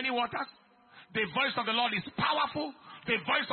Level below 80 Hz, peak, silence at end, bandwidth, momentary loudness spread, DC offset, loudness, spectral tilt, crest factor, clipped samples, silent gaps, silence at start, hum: -70 dBFS; -14 dBFS; 0 s; 4.5 kHz; 10 LU; under 0.1%; -31 LUFS; -1 dB/octave; 18 dB; under 0.1%; none; 0 s; none